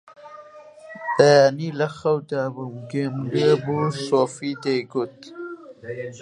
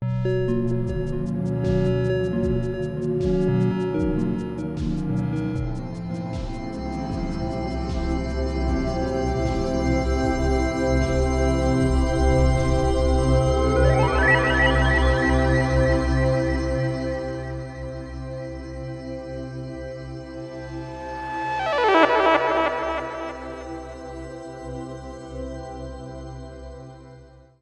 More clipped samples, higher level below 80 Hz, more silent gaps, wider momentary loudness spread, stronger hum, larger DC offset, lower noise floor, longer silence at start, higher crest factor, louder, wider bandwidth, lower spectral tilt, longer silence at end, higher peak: neither; second, -68 dBFS vs -30 dBFS; neither; first, 21 LU vs 16 LU; neither; neither; about the same, -44 dBFS vs -47 dBFS; about the same, 0.05 s vs 0 s; about the same, 22 dB vs 22 dB; about the same, -21 LUFS vs -23 LUFS; about the same, 11 kHz vs 10.5 kHz; about the same, -6 dB/octave vs -7 dB/octave; second, 0 s vs 0.35 s; about the same, -2 dBFS vs 0 dBFS